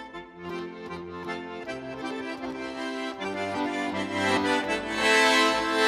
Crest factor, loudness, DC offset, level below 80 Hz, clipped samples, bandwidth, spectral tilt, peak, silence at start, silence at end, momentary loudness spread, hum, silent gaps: 18 dB; -27 LUFS; under 0.1%; -60 dBFS; under 0.1%; 16 kHz; -3 dB/octave; -10 dBFS; 0 s; 0 s; 17 LU; none; none